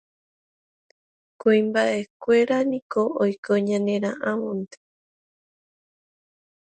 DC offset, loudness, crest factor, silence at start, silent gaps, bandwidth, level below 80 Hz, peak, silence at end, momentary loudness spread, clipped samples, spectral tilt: under 0.1%; -23 LUFS; 18 dB; 1.45 s; 2.10-2.20 s, 2.82-2.90 s, 3.38-3.43 s; 9.2 kHz; -72 dBFS; -8 dBFS; 2.1 s; 8 LU; under 0.1%; -6 dB/octave